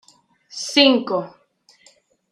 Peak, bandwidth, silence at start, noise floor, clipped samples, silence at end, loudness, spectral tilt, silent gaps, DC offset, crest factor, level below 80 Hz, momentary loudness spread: -2 dBFS; 11 kHz; 0.55 s; -56 dBFS; under 0.1%; 1 s; -17 LUFS; -2.5 dB/octave; none; under 0.1%; 20 dB; -74 dBFS; 22 LU